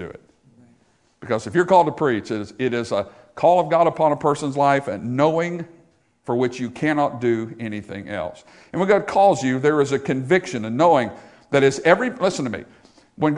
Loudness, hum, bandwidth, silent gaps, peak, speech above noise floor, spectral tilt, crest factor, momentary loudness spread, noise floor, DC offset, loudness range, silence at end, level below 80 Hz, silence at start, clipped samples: -20 LUFS; none; 11 kHz; none; 0 dBFS; 40 dB; -6 dB/octave; 20 dB; 13 LU; -60 dBFS; under 0.1%; 4 LU; 0 s; -60 dBFS; 0 s; under 0.1%